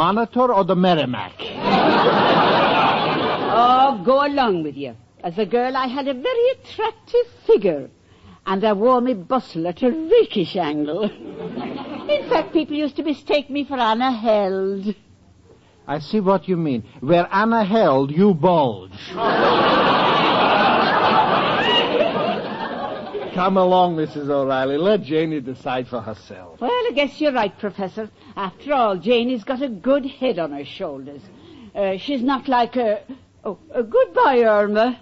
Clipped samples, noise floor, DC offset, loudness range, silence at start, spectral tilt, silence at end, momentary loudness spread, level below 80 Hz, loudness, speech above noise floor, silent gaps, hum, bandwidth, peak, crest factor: under 0.1%; -51 dBFS; under 0.1%; 6 LU; 0 s; -3.5 dB/octave; 0.05 s; 14 LU; -56 dBFS; -19 LUFS; 32 dB; none; none; 7.6 kHz; -6 dBFS; 14 dB